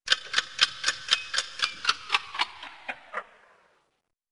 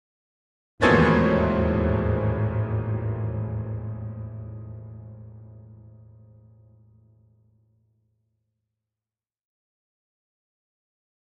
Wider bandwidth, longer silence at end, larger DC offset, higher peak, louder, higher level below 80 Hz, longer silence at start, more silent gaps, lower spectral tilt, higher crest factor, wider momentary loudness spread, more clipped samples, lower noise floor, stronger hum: first, 11.5 kHz vs 8.6 kHz; second, 1.05 s vs 5.35 s; first, 0.2% vs under 0.1%; about the same, -4 dBFS vs -6 dBFS; second, -27 LUFS vs -24 LUFS; second, -68 dBFS vs -40 dBFS; second, 0.05 s vs 0.8 s; neither; second, 2 dB/octave vs -8 dB/octave; first, 28 dB vs 22 dB; second, 15 LU vs 24 LU; neither; second, -76 dBFS vs under -90 dBFS; neither